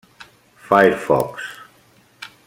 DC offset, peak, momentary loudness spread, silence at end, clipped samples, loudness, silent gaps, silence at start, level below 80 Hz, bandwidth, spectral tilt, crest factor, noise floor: under 0.1%; -2 dBFS; 23 LU; 0.2 s; under 0.1%; -17 LUFS; none; 0.2 s; -56 dBFS; 16.5 kHz; -5.5 dB/octave; 20 dB; -54 dBFS